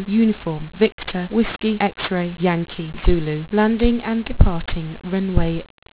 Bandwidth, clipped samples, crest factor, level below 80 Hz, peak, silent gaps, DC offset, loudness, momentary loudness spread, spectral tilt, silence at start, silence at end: 4 kHz; under 0.1%; 18 dB; -26 dBFS; 0 dBFS; 0.92-0.98 s; under 0.1%; -21 LUFS; 8 LU; -11 dB/octave; 0 s; 0.3 s